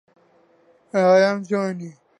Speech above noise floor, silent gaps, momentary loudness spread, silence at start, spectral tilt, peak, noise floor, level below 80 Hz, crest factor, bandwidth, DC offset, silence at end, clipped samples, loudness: 39 dB; none; 12 LU; 0.95 s; -6 dB/octave; -6 dBFS; -58 dBFS; -76 dBFS; 16 dB; 10 kHz; under 0.1%; 0.3 s; under 0.1%; -19 LUFS